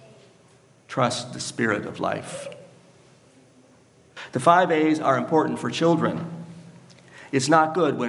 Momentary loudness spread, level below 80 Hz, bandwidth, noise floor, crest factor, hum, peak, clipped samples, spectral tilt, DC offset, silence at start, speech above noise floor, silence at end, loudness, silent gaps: 18 LU; -72 dBFS; 11.5 kHz; -56 dBFS; 24 dB; none; -2 dBFS; under 0.1%; -5 dB/octave; under 0.1%; 0.9 s; 34 dB; 0 s; -23 LUFS; none